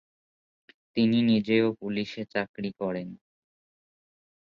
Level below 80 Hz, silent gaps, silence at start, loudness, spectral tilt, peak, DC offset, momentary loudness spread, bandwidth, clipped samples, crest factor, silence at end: -68 dBFS; 2.49-2.54 s; 0.95 s; -27 LUFS; -7.5 dB/octave; -12 dBFS; under 0.1%; 12 LU; 6.6 kHz; under 0.1%; 18 dB; 1.25 s